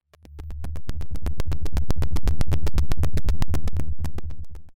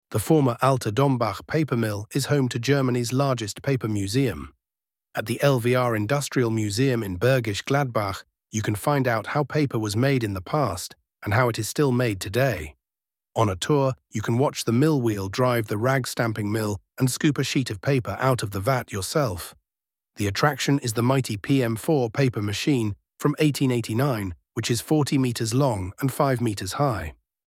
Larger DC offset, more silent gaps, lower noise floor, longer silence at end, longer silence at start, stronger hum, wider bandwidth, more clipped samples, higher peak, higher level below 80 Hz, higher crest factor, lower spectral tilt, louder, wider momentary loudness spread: neither; neither; second, -40 dBFS vs under -90 dBFS; second, 0 s vs 0.35 s; first, 0.35 s vs 0.1 s; neither; second, 12 kHz vs 16.5 kHz; neither; second, -10 dBFS vs -6 dBFS; first, -26 dBFS vs -54 dBFS; second, 6 dB vs 18 dB; about the same, -6.5 dB/octave vs -5.5 dB/octave; second, -29 LUFS vs -24 LUFS; first, 12 LU vs 6 LU